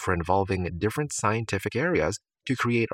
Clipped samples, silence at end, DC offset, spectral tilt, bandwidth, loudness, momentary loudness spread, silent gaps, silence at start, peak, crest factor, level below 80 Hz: under 0.1%; 0 s; under 0.1%; -5.5 dB/octave; 16.5 kHz; -27 LUFS; 5 LU; none; 0 s; -8 dBFS; 18 dB; -52 dBFS